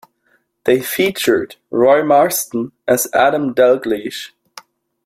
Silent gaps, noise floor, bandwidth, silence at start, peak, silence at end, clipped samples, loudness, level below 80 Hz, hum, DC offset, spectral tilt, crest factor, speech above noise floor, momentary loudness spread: none; -61 dBFS; 16.5 kHz; 0.65 s; 0 dBFS; 0.8 s; under 0.1%; -15 LUFS; -58 dBFS; none; under 0.1%; -3.5 dB/octave; 16 dB; 46 dB; 10 LU